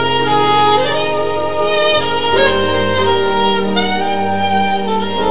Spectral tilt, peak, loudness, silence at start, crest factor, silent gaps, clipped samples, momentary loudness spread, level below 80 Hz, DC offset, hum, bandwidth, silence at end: -9 dB/octave; -2 dBFS; -14 LUFS; 0 s; 14 dB; none; under 0.1%; 5 LU; -40 dBFS; 7%; none; 4 kHz; 0 s